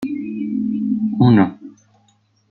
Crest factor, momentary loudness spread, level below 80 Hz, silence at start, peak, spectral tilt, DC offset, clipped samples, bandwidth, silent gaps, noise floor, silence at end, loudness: 18 dB; 11 LU; -56 dBFS; 0 s; -2 dBFS; -9.5 dB/octave; under 0.1%; under 0.1%; 4.5 kHz; none; -59 dBFS; 0.8 s; -18 LUFS